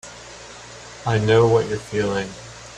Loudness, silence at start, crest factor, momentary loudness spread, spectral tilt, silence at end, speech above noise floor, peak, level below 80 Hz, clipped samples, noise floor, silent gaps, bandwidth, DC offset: -20 LUFS; 0.05 s; 18 dB; 22 LU; -6 dB/octave; 0 s; 21 dB; -4 dBFS; -48 dBFS; under 0.1%; -40 dBFS; none; 10.5 kHz; under 0.1%